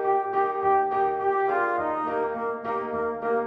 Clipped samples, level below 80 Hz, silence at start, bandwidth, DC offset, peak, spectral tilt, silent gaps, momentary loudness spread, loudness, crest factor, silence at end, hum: under 0.1%; -62 dBFS; 0 s; 5.2 kHz; under 0.1%; -12 dBFS; -7.5 dB/octave; none; 6 LU; -25 LUFS; 14 dB; 0 s; none